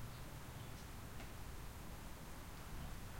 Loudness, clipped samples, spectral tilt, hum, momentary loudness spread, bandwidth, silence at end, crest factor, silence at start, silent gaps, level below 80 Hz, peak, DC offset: -53 LUFS; under 0.1%; -4.5 dB/octave; none; 2 LU; 16.5 kHz; 0 s; 12 dB; 0 s; none; -56 dBFS; -38 dBFS; 0.1%